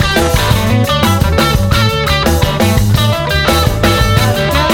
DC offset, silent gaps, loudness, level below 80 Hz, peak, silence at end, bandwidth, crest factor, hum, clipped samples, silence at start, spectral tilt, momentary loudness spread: under 0.1%; none; -11 LUFS; -20 dBFS; 0 dBFS; 0 s; 18.5 kHz; 10 dB; none; under 0.1%; 0 s; -5 dB/octave; 1 LU